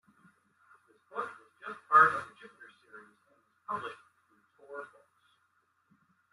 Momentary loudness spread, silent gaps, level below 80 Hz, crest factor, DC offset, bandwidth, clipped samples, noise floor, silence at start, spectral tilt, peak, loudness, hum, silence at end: 30 LU; none; -86 dBFS; 26 dB; under 0.1%; 11.5 kHz; under 0.1%; -74 dBFS; 1.15 s; -4.5 dB/octave; -10 dBFS; -29 LUFS; none; 1.5 s